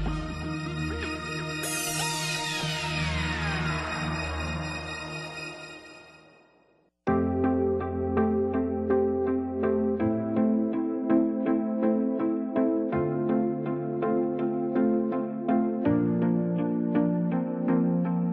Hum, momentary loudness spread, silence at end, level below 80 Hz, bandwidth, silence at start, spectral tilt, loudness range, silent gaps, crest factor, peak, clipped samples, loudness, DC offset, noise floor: none; 7 LU; 0 s; -46 dBFS; 12.5 kHz; 0 s; -5.5 dB/octave; 5 LU; none; 16 dB; -12 dBFS; under 0.1%; -27 LUFS; under 0.1%; -65 dBFS